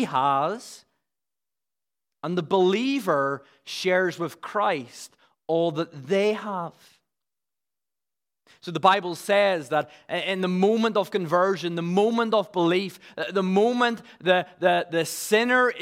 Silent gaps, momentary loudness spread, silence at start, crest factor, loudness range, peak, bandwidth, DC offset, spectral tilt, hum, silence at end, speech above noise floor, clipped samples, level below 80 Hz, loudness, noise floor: none; 12 LU; 0 s; 22 dB; 5 LU; -4 dBFS; 16 kHz; under 0.1%; -5 dB/octave; none; 0 s; over 66 dB; under 0.1%; -80 dBFS; -24 LUFS; under -90 dBFS